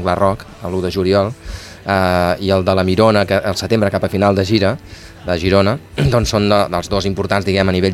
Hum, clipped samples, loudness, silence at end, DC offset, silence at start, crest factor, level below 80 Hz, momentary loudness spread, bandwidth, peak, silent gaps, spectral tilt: none; under 0.1%; -16 LUFS; 0 s; under 0.1%; 0 s; 16 dB; -36 dBFS; 9 LU; 15 kHz; 0 dBFS; none; -6 dB/octave